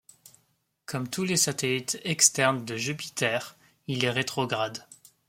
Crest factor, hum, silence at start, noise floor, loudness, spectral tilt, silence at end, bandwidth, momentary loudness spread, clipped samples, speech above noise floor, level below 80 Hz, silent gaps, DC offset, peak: 26 dB; none; 0.9 s; -72 dBFS; -26 LUFS; -2.5 dB/octave; 0.35 s; 16.5 kHz; 15 LU; under 0.1%; 44 dB; -70 dBFS; none; under 0.1%; -4 dBFS